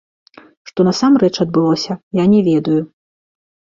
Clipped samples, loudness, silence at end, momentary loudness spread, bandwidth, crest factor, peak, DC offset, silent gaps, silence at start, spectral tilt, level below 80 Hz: under 0.1%; -15 LUFS; 0.9 s; 8 LU; 7.6 kHz; 14 dB; -2 dBFS; under 0.1%; 2.03-2.11 s; 0.75 s; -6.5 dB/octave; -54 dBFS